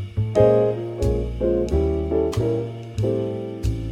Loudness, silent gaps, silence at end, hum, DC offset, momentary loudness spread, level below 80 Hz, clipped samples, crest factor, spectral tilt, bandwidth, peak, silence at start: -22 LUFS; none; 0 s; none; under 0.1%; 10 LU; -30 dBFS; under 0.1%; 16 dB; -8.5 dB/octave; 12.5 kHz; -4 dBFS; 0 s